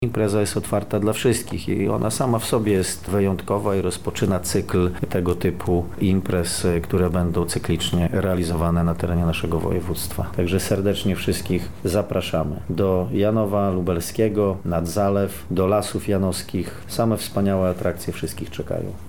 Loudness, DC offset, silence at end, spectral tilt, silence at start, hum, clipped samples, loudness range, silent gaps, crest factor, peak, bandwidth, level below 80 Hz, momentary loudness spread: -22 LUFS; 1%; 0 s; -6 dB/octave; 0 s; none; under 0.1%; 1 LU; none; 14 dB; -8 dBFS; 19.5 kHz; -40 dBFS; 5 LU